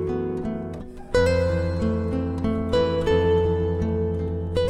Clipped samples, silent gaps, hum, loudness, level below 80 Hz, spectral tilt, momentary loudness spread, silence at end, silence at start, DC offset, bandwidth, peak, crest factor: under 0.1%; none; none; -24 LUFS; -36 dBFS; -7.5 dB/octave; 8 LU; 0 s; 0 s; under 0.1%; 10 kHz; -8 dBFS; 14 dB